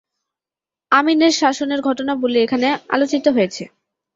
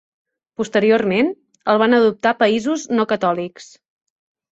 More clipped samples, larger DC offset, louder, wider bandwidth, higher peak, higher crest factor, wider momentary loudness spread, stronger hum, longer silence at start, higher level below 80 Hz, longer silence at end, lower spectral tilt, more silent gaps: neither; neither; about the same, -17 LUFS vs -18 LUFS; about the same, 7.8 kHz vs 8 kHz; about the same, 0 dBFS vs -2 dBFS; about the same, 18 dB vs 16 dB; second, 6 LU vs 11 LU; neither; first, 0.9 s vs 0.6 s; about the same, -64 dBFS vs -62 dBFS; second, 0.5 s vs 0.95 s; second, -3.5 dB/octave vs -5 dB/octave; neither